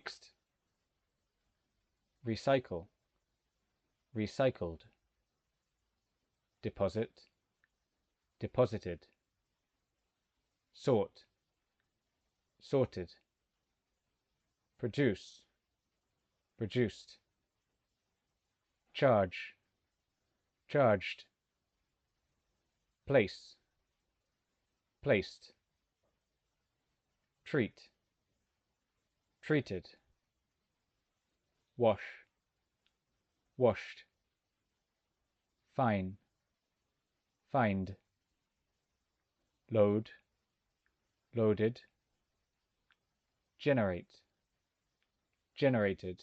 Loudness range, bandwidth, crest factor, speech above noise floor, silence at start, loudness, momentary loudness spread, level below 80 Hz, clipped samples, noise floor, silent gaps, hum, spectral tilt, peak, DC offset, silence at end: 7 LU; 8.4 kHz; 24 dB; 53 dB; 0.05 s; -35 LUFS; 17 LU; -72 dBFS; under 0.1%; -87 dBFS; none; none; -7.5 dB/octave; -16 dBFS; under 0.1%; 0.05 s